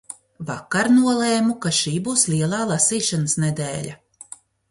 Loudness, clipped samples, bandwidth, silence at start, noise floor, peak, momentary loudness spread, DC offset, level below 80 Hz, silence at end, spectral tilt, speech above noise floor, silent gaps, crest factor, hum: -20 LUFS; under 0.1%; 11.5 kHz; 0.1 s; -44 dBFS; -4 dBFS; 18 LU; under 0.1%; -60 dBFS; 0.75 s; -4 dB/octave; 24 dB; none; 16 dB; none